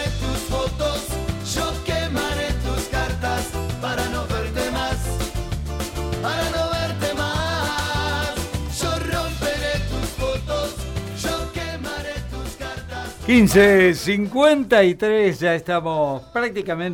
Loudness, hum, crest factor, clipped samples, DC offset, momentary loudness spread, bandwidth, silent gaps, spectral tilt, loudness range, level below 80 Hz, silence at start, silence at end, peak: -22 LUFS; none; 16 dB; under 0.1%; under 0.1%; 13 LU; 16.5 kHz; none; -5 dB/octave; 8 LU; -32 dBFS; 0 s; 0 s; -4 dBFS